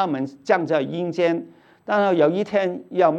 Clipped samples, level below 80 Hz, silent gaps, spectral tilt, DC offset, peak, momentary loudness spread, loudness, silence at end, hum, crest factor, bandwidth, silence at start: under 0.1%; -74 dBFS; none; -7 dB/octave; under 0.1%; -4 dBFS; 8 LU; -22 LUFS; 0 s; none; 18 dB; 8.2 kHz; 0 s